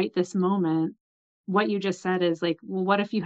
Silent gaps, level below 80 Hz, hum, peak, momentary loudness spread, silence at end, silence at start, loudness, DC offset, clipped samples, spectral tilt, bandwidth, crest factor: 1.00-1.44 s; -76 dBFS; none; -8 dBFS; 4 LU; 0 s; 0 s; -26 LUFS; under 0.1%; under 0.1%; -6.5 dB/octave; 8 kHz; 18 dB